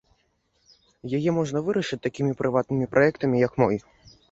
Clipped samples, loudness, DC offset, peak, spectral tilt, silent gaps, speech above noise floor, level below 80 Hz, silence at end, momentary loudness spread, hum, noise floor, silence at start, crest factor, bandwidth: under 0.1%; -24 LUFS; under 0.1%; -6 dBFS; -7 dB/octave; none; 46 dB; -58 dBFS; 0.5 s; 8 LU; none; -69 dBFS; 1.05 s; 20 dB; 8 kHz